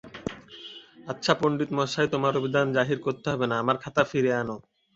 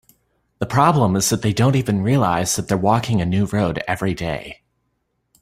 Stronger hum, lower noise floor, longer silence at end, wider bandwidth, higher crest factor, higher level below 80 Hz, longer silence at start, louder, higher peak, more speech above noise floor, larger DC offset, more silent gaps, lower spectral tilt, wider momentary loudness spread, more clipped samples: neither; second, -46 dBFS vs -71 dBFS; second, 0.35 s vs 0.9 s; second, 8 kHz vs 16 kHz; about the same, 22 dB vs 18 dB; second, -60 dBFS vs -46 dBFS; second, 0.05 s vs 0.6 s; second, -26 LUFS vs -19 LUFS; second, -6 dBFS vs -2 dBFS; second, 20 dB vs 53 dB; neither; neither; about the same, -5.5 dB/octave vs -5.5 dB/octave; first, 18 LU vs 9 LU; neither